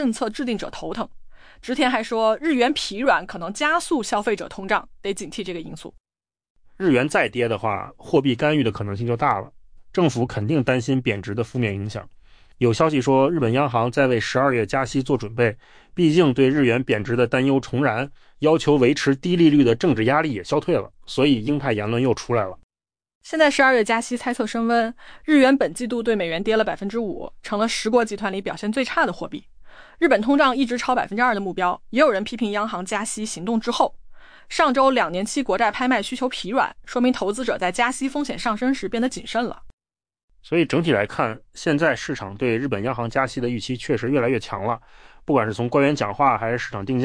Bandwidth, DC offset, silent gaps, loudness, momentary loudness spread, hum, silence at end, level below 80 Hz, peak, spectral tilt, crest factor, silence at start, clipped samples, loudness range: 10.5 kHz; under 0.1%; 6.00-6.04 s, 6.50-6.55 s, 22.63-22.69 s, 23.15-23.21 s, 39.73-39.78 s, 40.23-40.28 s; -21 LUFS; 10 LU; none; 0 s; -50 dBFS; -6 dBFS; -5.5 dB/octave; 16 dB; 0 s; under 0.1%; 5 LU